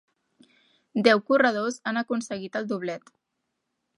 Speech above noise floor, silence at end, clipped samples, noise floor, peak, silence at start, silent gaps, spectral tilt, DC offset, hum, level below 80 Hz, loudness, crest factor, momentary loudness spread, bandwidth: 55 dB; 1 s; under 0.1%; -80 dBFS; -2 dBFS; 0.95 s; none; -4.5 dB/octave; under 0.1%; none; -78 dBFS; -25 LUFS; 24 dB; 12 LU; 11.5 kHz